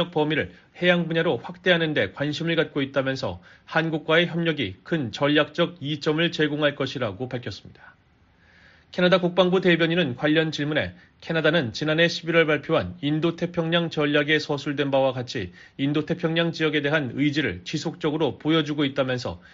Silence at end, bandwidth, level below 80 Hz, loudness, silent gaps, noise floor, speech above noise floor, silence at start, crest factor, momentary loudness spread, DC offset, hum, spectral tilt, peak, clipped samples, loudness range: 0.15 s; 7.6 kHz; -60 dBFS; -24 LUFS; none; -59 dBFS; 35 dB; 0 s; 20 dB; 9 LU; under 0.1%; none; -4 dB/octave; -4 dBFS; under 0.1%; 3 LU